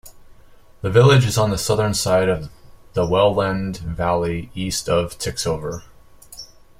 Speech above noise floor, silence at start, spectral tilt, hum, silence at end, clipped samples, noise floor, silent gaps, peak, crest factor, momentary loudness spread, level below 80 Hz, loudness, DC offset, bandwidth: 27 dB; 0.05 s; -5 dB/octave; none; 0.35 s; under 0.1%; -46 dBFS; none; -2 dBFS; 18 dB; 19 LU; -42 dBFS; -19 LUFS; under 0.1%; 16 kHz